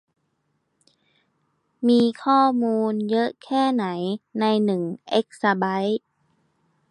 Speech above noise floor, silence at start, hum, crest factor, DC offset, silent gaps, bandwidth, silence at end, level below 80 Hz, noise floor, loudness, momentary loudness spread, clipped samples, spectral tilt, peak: 51 dB; 1.8 s; none; 18 dB; under 0.1%; none; 10.5 kHz; 0.95 s; -74 dBFS; -72 dBFS; -22 LUFS; 8 LU; under 0.1%; -6.5 dB/octave; -6 dBFS